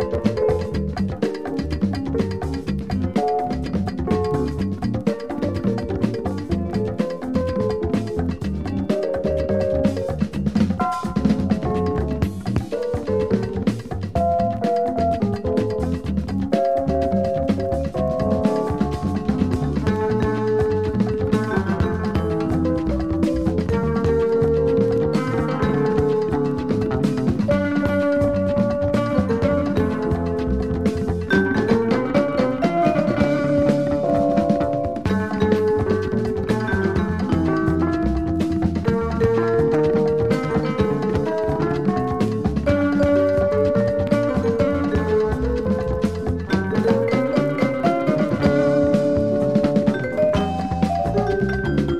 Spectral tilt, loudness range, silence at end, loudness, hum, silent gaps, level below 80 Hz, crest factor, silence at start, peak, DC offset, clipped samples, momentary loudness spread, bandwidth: -8 dB/octave; 4 LU; 0 s; -21 LUFS; none; none; -34 dBFS; 18 dB; 0 s; -2 dBFS; 0.6%; under 0.1%; 6 LU; 12 kHz